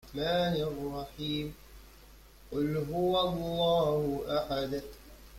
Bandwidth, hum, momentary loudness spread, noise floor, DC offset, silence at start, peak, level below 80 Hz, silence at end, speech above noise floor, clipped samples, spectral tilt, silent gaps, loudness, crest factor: 16.5 kHz; none; 11 LU; -55 dBFS; under 0.1%; 0.05 s; -18 dBFS; -52 dBFS; 0 s; 24 dB; under 0.1%; -6 dB/octave; none; -32 LUFS; 16 dB